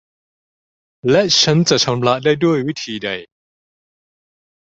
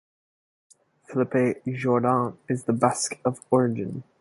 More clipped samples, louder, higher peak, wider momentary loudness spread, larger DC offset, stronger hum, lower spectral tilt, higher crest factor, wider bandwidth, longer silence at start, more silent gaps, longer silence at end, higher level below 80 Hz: neither; first, -15 LUFS vs -25 LUFS; first, 0 dBFS vs -6 dBFS; first, 12 LU vs 7 LU; neither; neither; second, -4 dB/octave vs -6 dB/octave; about the same, 18 dB vs 20 dB; second, 8 kHz vs 11.5 kHz; about the same, 1.05 s vs 1.1 s; neither; first, 1.4 s vs 0.2 s; first, -54 dBFS vs -66 dBFS